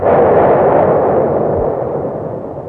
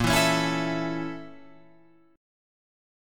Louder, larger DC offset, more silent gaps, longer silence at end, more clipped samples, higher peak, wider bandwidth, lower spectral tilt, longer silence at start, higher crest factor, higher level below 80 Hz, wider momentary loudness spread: first, -12 LUFS vs -26 LUFS; neither; neither; second, 0 s vs 0.95 s; neither; first, 0 dBFS vs -10 dBFS; second, 4 kHz vs 17.5 kHz; first, -11 dB/octave vs -4 dB/octave; about the same, 0 s vs 0 s; second, 12 dB vs 20 dB; first, -38 dBFS vs -48 dBFS; second, 11 LU vs 19 LU